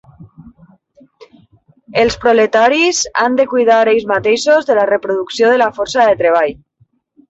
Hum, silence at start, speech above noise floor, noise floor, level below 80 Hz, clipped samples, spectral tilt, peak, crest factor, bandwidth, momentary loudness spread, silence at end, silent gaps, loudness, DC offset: none; 0.2 s; 44 dB; -56 dBFS; -48 dBFS; under 0.1%; -3 dB/octave; -2 dBFS; 12 dB; 8.2 kHz; 5 LU; 0.75 s; none; -12 LUFS; under 0.1%